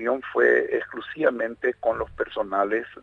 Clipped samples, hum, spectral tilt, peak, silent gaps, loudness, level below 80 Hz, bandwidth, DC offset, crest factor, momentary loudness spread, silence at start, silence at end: under 0.1%; none; -6.5 dB/octave; -6 dBFS; none; -24 LUFS; -54 dBFS; 6.6 kHz; under 0.1%; 18 dB; 9 LU; 0 s; 0 s